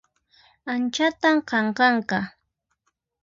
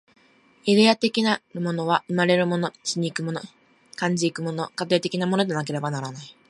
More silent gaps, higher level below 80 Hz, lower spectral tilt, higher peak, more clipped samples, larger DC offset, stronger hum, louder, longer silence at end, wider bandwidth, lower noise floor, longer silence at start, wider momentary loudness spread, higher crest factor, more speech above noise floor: neither; about the same, -66 dBFS vs -70 dBFS; about the same, -4.5 dB/octave vs -5 dB/octave; about the same, -6 dBFS vs -4 dBFS; neither; neither; neither; about the same, -22 LUFS vs -23 LUFS; first, 0.95 s vs 0.2 s; second, 7.6 kHz vs 11.5 kHz; first, -75 dBFS vs -57 dBFS; about the same, 0.65 s vs 0.65 s; about the same, 11 LU vs 11 LU; about the same, 18 dB vs 20 dB; first, 53 dB vs 33 dB